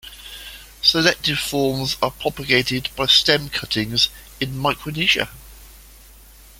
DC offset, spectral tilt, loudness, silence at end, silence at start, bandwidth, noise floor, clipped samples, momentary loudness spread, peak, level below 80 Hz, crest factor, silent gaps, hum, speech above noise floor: under 0.1%; -3 dB/octave; -19 LUFS; 0.75 s; 0.05 s; 17 kHz; -45 dBFS; under 0.1%; 15 LU; -2 dBFS; -44 dBFS; 20 dB; none; none; 25 dB